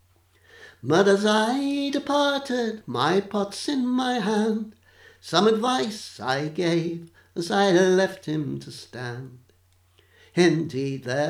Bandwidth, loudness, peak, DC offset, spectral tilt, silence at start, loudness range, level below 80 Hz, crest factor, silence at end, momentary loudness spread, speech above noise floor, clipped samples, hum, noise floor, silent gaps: 15 kHz; -24 LUFS; -4 dBFS; under 0.1%; -5 dB/octave; 0.6 s; 3 LU; -68 dBFS; 20 dB; 0 s; 16 LU; 37 dB; under 0.1%; none; -61 dBFS; none